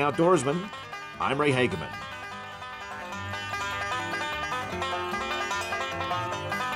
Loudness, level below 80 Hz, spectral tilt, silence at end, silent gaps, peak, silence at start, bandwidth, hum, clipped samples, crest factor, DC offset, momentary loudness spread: -29 LUFS; -58 dBFS; -4.5 dB/octave; 0 s; none; -12 dBFS; 0 s; 16 kHz; none; under 0.1%; 18 dB; under 0.1%; 14 LU